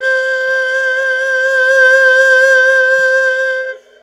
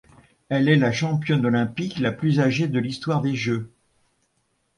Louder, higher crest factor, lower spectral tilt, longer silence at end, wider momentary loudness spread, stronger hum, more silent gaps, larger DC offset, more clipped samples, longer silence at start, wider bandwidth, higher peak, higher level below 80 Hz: first, -10 LUFS vs -22 LUFS; second, 12 dB vs 18 dB; second, 2 dB/octave vs -7 dB/octave; second, 0.25 s vs 1.1 s; about the same, 7 LU vs 8 LU; neither; neither; neither; neither; second, 0 s vs 0.5 s; first, 12.5 kHz vs 11 kHz; first, 0 dBFS vs -6 dBFS; second, -84 dBFS vs -58 dBFS